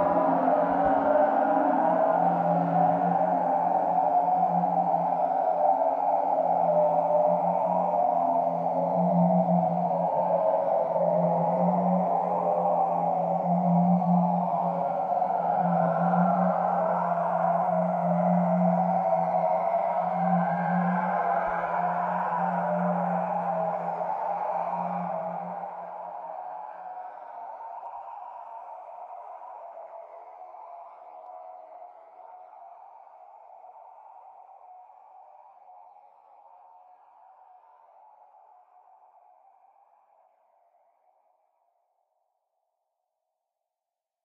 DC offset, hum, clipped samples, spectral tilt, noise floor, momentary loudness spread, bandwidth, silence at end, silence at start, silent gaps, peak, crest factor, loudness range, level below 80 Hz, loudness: under 0.1%; none; under 0.1%; -10.5 dB/octave; -89 dBFS; 19 LU; 3.8 kHz; 8.45 s; 0 s; none; -10 dBFS; 16 dB; 18 LU; -70 dBFS; -25 LUFS